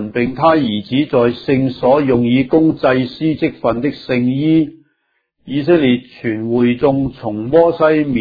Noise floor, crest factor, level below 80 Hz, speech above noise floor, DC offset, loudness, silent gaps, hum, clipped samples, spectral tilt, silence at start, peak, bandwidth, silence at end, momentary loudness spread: -66 dBFS; 14 dB; -46 dBFS; 52 dB; under 0.1%; -15 LUFS; none; none; under 0.1%; -9.5 dB/octave; 0 s; 0 dBFS; 5 kHz; 0 s; 7 LU